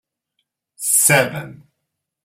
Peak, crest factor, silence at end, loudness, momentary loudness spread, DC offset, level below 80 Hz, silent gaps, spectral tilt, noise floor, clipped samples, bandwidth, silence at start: 0 dBFS; 22 dB; 0.7 s; -15 LUFS; 20 LU; under 0.1%; -64 dBFS; none; -2.5 dB/octave; -78 dBFS; under 0.1%; 16 kHz; 0.8 s